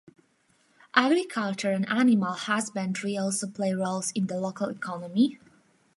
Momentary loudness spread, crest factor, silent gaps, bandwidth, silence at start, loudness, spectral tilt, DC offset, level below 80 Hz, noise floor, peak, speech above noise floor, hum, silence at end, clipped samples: 8 LU; 24 dB; none; 11.5 kHz; 0.95 s; -27 LUFS; -4.5 dB/octave; under 0.1%; -78 dBFS; -67 dBFS; -4 dBFS; 40 dB; none; 0.6 s; under 0.1%